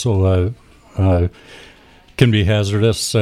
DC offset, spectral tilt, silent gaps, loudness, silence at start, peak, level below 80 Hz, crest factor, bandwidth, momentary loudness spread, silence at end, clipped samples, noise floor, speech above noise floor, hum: under 0.1%; -6 dB/octave; none; -17 LUFS; 0 s; 0 dBFS; -36 dBFS; 16 dB; 14 kHz; 9 LU; 0 s; under 0.1%; -36 dBFS; 20 dB; none